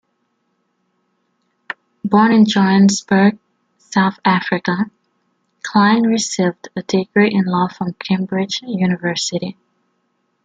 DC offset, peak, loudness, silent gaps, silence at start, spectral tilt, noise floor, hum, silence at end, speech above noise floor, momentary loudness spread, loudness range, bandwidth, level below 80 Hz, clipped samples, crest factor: under 0.1%; -2 dBFS; -16 LUFS; none; 2.05 s; -5 dB/octave; -67 dBFS; none; 0.95 s; 52 dB; 13 LU; 4 LU; 9 kHz; -60 dBFS; under 0.1%; 16 dB